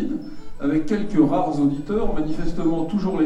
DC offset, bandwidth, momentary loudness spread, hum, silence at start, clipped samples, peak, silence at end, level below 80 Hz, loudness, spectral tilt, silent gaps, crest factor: under 0.1%; 8.6 kHz; 9 LU; none; 0 s; under 0.1%; -6 dBFS; 0 s; -34 dBFS; -23 LUFS; -8.5 dB/octave; none; 16 dB